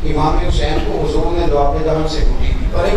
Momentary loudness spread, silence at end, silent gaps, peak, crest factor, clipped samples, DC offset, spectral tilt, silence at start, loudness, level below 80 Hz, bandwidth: 4 LU; 0 s; none; -2 dBFS; 12 dB; under 0.1%; under 0.1%; -6.5 dB/octave; 0 s; -17 LUFS; -16 dBFS; 9 kHz